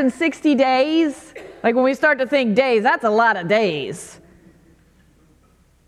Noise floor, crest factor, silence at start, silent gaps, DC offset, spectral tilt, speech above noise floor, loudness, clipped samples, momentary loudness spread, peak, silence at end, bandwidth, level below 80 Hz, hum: -56 dBFS; 18 dB; 0 s; none; under 0.1%; -5 dB/octave; 38 dB; -18 LUFS; under 0.1%; 14 LU; -2 dBFS; 1.75 s; 12.5 kHz; -60 dBFS; none